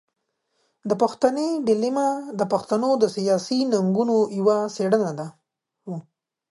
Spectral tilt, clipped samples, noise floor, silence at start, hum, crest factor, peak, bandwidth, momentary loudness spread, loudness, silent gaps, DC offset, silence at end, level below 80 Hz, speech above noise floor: -6 dB/octave; under 0.1%; -76 dBFS; 0.85 s; none; 20 dB; -4 dBFS; 11.5 kHz; 15 LU; -22 LUFS; none; under 0.1%; 0.55 s; -70 dBFS; 54 dB